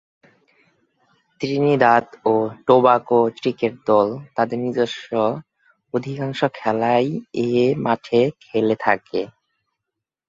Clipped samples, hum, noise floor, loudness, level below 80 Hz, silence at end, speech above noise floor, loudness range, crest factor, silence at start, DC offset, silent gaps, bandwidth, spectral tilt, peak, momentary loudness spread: under 0.1%; none; -83 dBFS; -20 LUFS; -64 dBFS; 1 s; 64 dB; 4 LU; 18 dB; 1.4 s; under 0.1%; none; 7.6 kHz; -7 dB/octave; -2 dBFS; 11 LU